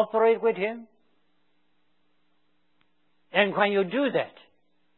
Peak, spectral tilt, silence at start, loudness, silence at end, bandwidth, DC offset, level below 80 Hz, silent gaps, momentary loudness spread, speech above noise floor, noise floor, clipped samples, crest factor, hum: -6 dBFS; -9 dB/octave; 0 s; -25 LUFS; 0.7 s; 4.2 kHz; under 0.1%; -86 dBFS; none; 10 LU; 49 dB; -74 dBFS; under 0.1%; 22 dB; none